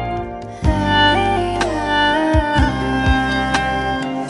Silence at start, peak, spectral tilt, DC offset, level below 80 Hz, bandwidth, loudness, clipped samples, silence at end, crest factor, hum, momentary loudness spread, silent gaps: 0 s; -2 dBFS; -5.5 dB/octave; under 0.1%; -26 dBFS; 11.5 kHz; -17 LUFS; under 0.1%; 0 s; 16 dB; none; 7 LU; none